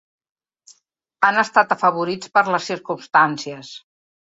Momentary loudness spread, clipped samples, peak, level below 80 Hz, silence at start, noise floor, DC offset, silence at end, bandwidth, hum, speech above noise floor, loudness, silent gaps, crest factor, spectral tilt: 16 LU; under 0.1%; -2 dBFS; -70 dBFS; 1.2 s; -62 dBFS; under 0.1%; 0.45 s; 8 kHz; none; 43 dB; -18 LUFS; none; 20 dB; -4 dB/octave